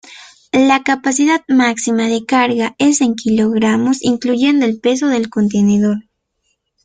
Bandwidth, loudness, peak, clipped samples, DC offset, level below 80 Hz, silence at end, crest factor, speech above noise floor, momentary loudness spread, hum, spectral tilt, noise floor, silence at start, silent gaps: 9.6 kHz; -14 LUFS; 0 dBFS; under 0.1%; under 0.1%; -54 dBFS; 0.85 s; 14 dB; 54 dB; 4 LU; none; -4.5 dB/octave; -67 dBFS; 0.05 s; none